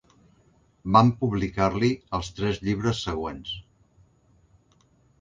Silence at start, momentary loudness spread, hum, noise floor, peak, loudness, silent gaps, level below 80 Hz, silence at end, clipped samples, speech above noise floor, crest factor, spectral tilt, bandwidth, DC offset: 0.85 s; 16 LU; none; -62 dBFS; -4 dBFS; -25 LUFS; none; -46 dBFS; 1.6 s; under 0.1%; 38 dB; 24 dB; -6.5 dB/octave; 7.6 kHz; under 0.1%